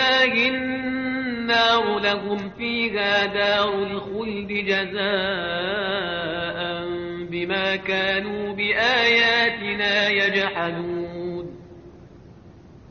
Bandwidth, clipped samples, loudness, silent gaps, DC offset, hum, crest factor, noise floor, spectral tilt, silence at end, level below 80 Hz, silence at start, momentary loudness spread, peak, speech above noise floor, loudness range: 6.8 kHz; under 0.1%; -22 LUFS; none; under 0.1%; none; 16 dB; -46 dBFS; -1 dB/octave; 0 s; -54 dBFS; 0 s; 11 LU; -6 dBFS; 23 dB; 5 LU